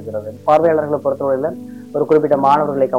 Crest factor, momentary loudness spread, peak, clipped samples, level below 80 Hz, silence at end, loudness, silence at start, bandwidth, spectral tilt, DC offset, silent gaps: 12 dB; 12 LU; -4 dBFS; under 0.1%; -60 dBFS; 0 s; -16 LUFS; 0 s; 15.5 kHz; -8 dB/octave; 0.3%; none